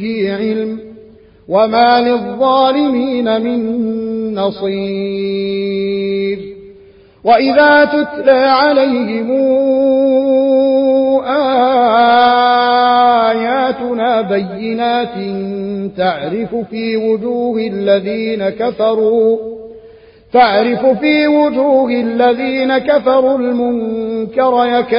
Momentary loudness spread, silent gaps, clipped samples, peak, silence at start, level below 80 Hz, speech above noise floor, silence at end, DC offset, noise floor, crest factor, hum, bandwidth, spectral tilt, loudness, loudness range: 9 LU; none; under 0.1%; 0 dBFS; 0 s; -52 dBFS; 30 dB; 0 s; under 0.1%; -42 dBFS; 12 dB; none; 5.4 kHz; -10.5 dB/octave; -13 LUFS; 6 LU